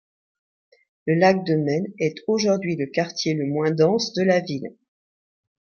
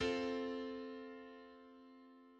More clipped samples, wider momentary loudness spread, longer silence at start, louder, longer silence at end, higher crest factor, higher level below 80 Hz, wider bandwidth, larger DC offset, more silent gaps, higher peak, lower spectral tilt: neither; second, 8 LU vs 21 LU; first, 1.05 s vs 0 s; first, -22 LUFS vs -44 LUFS; first, 0.95 s vs 0 s; about the same, 20 dB vs 18 dB; about the same, -68 dBFS vs -70 dBFS; second, 7 kHz vs 9 kHz; neither; neither; first, -4 dBFS vs -26 dBFS; about the same, -5.5 dB/octave vs -5 dB/octave